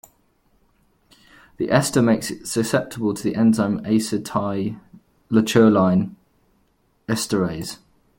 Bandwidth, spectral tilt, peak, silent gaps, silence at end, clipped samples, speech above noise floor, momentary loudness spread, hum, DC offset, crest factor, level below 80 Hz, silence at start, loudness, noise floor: 16.5 kHz; -5.5 dB/octave; -2 dBFS; none; 0.45 s; under 0.1%; 44 dB; 15 LU; none; under 0.1%; 20 dB; -56 dBFS; 1.6 s; -20 LUFS; -64 dBFS